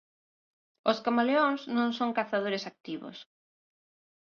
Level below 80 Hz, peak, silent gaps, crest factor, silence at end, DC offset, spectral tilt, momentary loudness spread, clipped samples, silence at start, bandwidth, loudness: -80 dBFS; -12 dBFS; 2.80-2.84 s; 20 dB; 1 s; under 0.1%; -5.5 dB/octave; 15 LU; under 0.1%; 0.85 s; 6.8 kHz; -29 LUFS